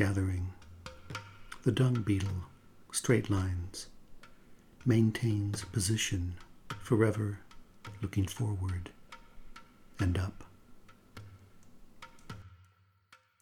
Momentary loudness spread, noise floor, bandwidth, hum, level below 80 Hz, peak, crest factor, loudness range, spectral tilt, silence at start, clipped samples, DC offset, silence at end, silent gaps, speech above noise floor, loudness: 23 LU; -66 dBFS; 16.5 kHz; none; -54 dBFS; -12 dBFS; 22 dB; 9 LU; -5.5 dB/octave; 0 s; under 0.1%; under 0.1%; 0.85 s; none; 35 dB; -33 LUFS